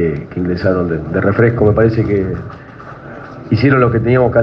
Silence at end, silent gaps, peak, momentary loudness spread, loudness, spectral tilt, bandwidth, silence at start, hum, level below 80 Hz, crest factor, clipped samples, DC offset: 0 s; none; 0 dBFS; 20 LU; -14 LUFS; -10 dB/octave; 5.8 kHz; 0 s; none; -38 dBFS; 14 dB; under 0.1%; under 0.1%